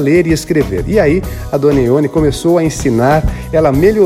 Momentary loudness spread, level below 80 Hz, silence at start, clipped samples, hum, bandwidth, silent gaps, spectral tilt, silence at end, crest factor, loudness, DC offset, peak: 4 LU; -26 dBFS; 0 s; under 0.1%; none; 16 kHz; none; -6.5 dB/octave; 0 s; 10 dB; -12 LUFS; under 0.1%; 0 dBFS